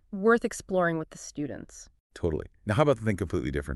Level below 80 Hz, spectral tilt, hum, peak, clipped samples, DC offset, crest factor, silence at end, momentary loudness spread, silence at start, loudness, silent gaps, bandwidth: -46 dBFS; -6 dB/octave; none; -8 dBFS; under 0.1%; under 0.1%; 20 dB; 0 s; 14 LU; 0.1 s; -28 LUFS; 2.00-2.10 s; 12 kHz